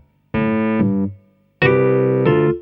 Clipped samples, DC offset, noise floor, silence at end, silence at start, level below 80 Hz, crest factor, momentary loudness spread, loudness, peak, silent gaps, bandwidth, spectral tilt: under 0.1%; under 0.1%; -45 dBFS; 0 s; 0.35 s; -48 dBFS; 16 dB; 8 LU; -17 LUFS; -2 dBFS; none; 5.4 kHz; -11 dB/octave